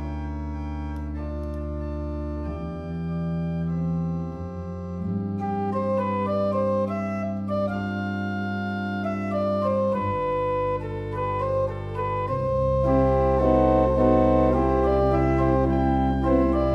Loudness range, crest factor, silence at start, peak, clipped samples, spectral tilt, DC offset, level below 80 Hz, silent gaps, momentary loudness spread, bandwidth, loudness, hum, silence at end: 9 LU; 16 dB; 0 s; -8 dBFS; under 0.1%; -9.5 dB/octave; under 0.1%; -34 dBFS; none; 12 LU; 7 kHz; -25 LUFS; none; 0 s